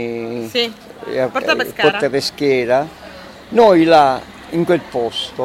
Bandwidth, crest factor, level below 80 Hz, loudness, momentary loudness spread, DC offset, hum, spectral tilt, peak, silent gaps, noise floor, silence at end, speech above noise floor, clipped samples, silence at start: 16 kHz; 16 dB; -50 dBFS; -16 LUFS; 14 LU; under 0.1%; none; -5 dB/octave; 0 dBFS; none; -36 dBFS; 0 s; 20 dB; under 0.1%; 0 s